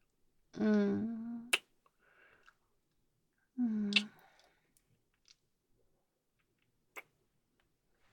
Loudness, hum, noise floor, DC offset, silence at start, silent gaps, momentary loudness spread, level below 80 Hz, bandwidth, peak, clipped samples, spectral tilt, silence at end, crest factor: -35 LUFS; none; -81 dBFS; under 0.1%; 0.55 s; none; 22 LU; -80 dBFS; 17 kHz; -12 dBFS; under 0.1%; -4.5 dB/octave; 1.15 s; 28 dB